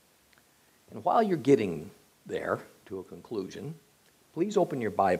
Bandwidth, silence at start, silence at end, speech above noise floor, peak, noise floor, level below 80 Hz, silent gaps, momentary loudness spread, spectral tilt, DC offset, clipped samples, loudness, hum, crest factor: 15.5 kHz; 0.9 s; 0 s; 35 dB; -10 dBFS; -64 dBFS; -72 dBFS; none; 18 LU; -6.5 dB/octave; under 0.1%; under 0.1%; -29 LUFS; none; 22 dB